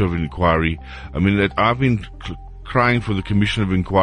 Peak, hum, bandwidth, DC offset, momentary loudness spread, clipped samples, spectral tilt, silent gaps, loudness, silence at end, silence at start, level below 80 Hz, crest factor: -4 dBFS; none; 10 kHz; under 0.1%; 14 LU; under 0.1%; -7.5 dB/octave; none; -19 LUFS; 0 s; 0 s; -32 dBFS; 16 dB